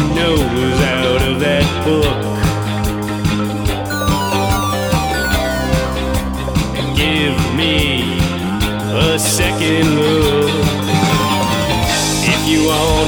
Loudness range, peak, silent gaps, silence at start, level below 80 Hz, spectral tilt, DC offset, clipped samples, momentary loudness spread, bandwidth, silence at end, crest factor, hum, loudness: 3 LU; -2 dBFS; none; 0 s; -26 dBFS; -4.5 dB/octave; under 0.1%; under 0.1%; 5 LU; over 20 kHz; 0 s; 14 dB; none; -15 LUFS